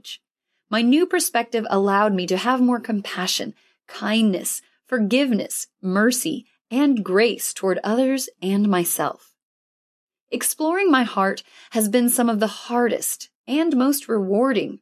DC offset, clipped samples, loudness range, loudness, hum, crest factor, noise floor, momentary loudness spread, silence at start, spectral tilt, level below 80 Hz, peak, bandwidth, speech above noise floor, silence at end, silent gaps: under 0.1%; under 0.1%; 2 LU; -21 LUFS; none; 16 dB; -77 dBFS; 10 LU; 0.05 s; -4 dB/octave; -78 dBFS; -4 dBFS; 14.5 kHz; 57 dB; 0.05 s; 0.31-0.35 s, 9.45-10.07 s, 10.21-10.27 s, 13.35-13.44 s